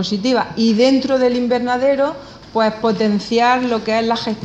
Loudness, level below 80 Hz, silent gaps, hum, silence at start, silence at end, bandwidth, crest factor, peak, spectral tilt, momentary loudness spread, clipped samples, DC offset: -16 LUFS; -50 dBFS; none; none; 0 s; 0 s; 8.6 kHz; 14 dB; -2 dBFS; -5.5 dB/octave; 5 LU; under 0.1%; under 0.1%